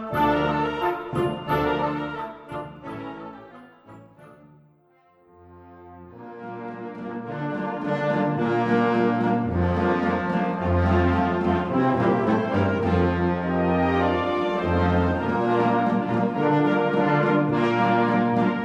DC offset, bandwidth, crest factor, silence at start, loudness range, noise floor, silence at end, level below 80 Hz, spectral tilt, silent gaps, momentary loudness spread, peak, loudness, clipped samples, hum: under 0.1%; 13 kHz; 16 dB; 0 s; 18 LU; -59 dBFS; 0 s; -44 dBFS; -8.5 dB/octave; none; 14 LU; -8 dBFS; -23 LUFS; under 0.1%; none